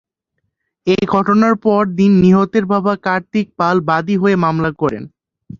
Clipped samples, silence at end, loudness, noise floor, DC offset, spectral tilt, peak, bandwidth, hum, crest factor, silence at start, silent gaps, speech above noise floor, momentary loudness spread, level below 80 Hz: under 0.1%; 0.05 s; -14 LUFS; -72 dBFS; under 0.1%; -8 dB/octave; 0 dBFS; 7.2 kHz; none; 14 dB; 0.85 s; none; 58 dB; 8 LU; -48 dBFS